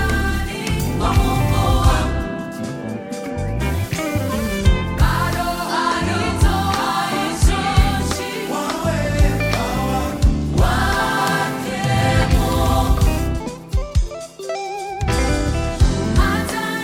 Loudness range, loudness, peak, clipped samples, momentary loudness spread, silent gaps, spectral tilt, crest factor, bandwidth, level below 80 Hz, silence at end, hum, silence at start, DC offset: 3 LU; -19 LUFS; -2 dBFS; under 0.1%; 9 LU; none; -5.5 dB/octave; 16 dB; 17 kHz; -22 dBFS; 0 s; none; 0 s; under 0.1%